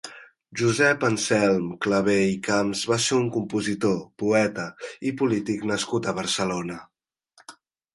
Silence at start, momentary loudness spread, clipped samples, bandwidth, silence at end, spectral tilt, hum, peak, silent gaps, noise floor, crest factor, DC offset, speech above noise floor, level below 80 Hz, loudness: 0.05 s; 11 LU; under 0.1%; 11.5 kHz; 0.4 s; -4.5 dB/octave; none; -6 dBFS; none; -60 dBFS; 18 dB; under 0.1%; 37 dB; -60 dBFS; -24 LUFS